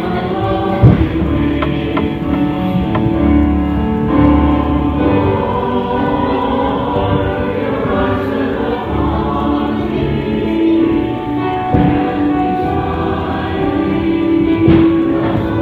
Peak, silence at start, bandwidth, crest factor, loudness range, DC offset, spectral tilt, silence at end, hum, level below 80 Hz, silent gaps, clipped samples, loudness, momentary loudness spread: 0 dBFS; 0 s; 5 kHz; 14 dB; 2 LU; under 0.1%; -9.5 dB/octave; 0 s; none; -26 dBFS; none; under 0.1%; -14 LUFS; 6 LU